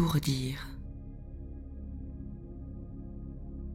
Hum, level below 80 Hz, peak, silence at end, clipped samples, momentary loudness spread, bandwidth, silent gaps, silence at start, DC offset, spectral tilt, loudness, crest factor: none; -44 dBFS; -16 dBFS; 0 s; under 0.1%; 14 LU; 16.5 kHz; none; 0 s; under 0.1%; -5.5 dB/octave; -39 LUFS; 20 dB